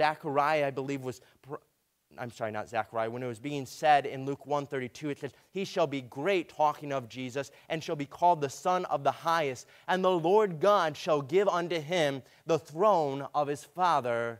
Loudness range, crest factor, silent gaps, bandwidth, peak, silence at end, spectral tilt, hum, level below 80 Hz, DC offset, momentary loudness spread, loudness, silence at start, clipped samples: 5 LU; 20 dB; none; 16 kHz; -10 dBFS; 0 s; -5 dB/octave; none; -76 dBFS; under 0.1%; 12 LU; -30 LUFS; 0 s; under 0.1%